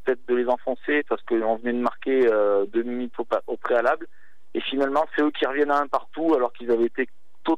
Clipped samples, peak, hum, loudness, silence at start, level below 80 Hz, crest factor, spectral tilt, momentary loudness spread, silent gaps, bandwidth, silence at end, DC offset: under 0.1%; -8 dBFS; none; -24 LUFS; 0.05 s; -72 dBFS; 16 dB; -5.5 dB/octave; 8 LU; none; 8.2 kHz; 0 s; 2%